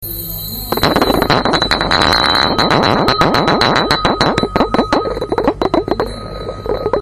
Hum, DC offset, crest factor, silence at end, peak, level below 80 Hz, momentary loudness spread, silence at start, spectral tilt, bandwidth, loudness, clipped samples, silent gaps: none; under 0.1%; 14 dB; 0 s; 0 dBFS; -30 dBFS; 10 LU; 0 s; -4.5 dB/octave; 16 kHz; -13 LUFS; 0.2%; none